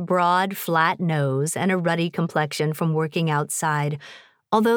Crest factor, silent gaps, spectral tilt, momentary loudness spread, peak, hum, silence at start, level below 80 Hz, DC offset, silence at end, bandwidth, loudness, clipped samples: 18 dB; none; -5.5 dB/octave; 4 LU; -6 dBFS; none; 0 s; -74 dBFS; under 0.1%; 0 s; over 20 kHz; -22 LUFS; under 0.1%